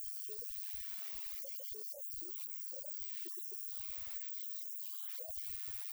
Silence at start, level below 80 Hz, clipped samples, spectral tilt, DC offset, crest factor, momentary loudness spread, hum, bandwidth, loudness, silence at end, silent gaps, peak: 0 s; -70 dBFS; under 0.1%; -1 dB/octave; under 0.1%; 18 dB; 1 LU; none; over 20 kHz; -41 LUFS; 0 s; none; -26 dBFS